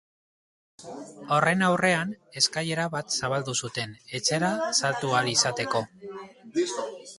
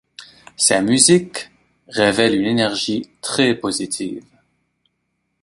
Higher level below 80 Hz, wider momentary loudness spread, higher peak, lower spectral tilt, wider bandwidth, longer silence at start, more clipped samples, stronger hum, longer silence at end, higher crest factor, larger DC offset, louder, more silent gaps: second, -66 dBFS vs -56 dBFS; about the same, 19 LU vs 17 LU; second, -6 dBFS vs 0 dBFS; about the same, -3 dB/octave vs -3 dB/octave; about the same, 11.5 kHz vs 11.5 kHz; first, 0.8 s vs 0.2 s; neither; neither; second, 0.05 s vs 1.2 s; about the same, 22 dB vs 20 dB; neither; second, -26 LUFS vs -17 LUFS; neither